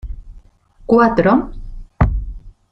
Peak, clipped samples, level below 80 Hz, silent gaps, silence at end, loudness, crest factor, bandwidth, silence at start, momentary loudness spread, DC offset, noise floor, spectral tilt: -2 dBFS; under 0.1%; -26 dBFS; none; 0.2 s; -15 LUFS; 16 dB; 6.2 kHz; 0.05 s; 24 LU; under 0.1%; -45 dBFS; -9.5 dB/octave